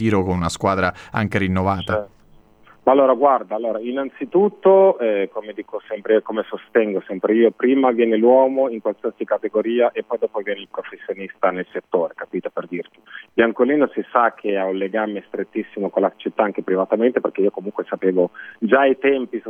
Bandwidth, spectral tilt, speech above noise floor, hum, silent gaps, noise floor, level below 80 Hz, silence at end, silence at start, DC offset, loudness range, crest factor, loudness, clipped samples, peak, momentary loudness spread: 10.5 kHz; -7 dB/octave; 31 dB; none; none; -50 dBFS; -54 dBFS; 0 s; 0 s; under 0.1%; 5 LU; 18 dB; -19 LUFS; under 0.1%; 0 dBFS; 13 LU